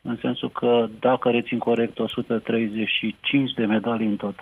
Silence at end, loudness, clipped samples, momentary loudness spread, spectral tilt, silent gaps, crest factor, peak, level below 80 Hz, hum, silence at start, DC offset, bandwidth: 0 s; -23 LUFS; under 0.1%; 5 LU; -7.5 dB/octave; none; 14 dB; -8 dBFS; -64 dBFS; none; 0.05 s; under 0.1%; 11 kHz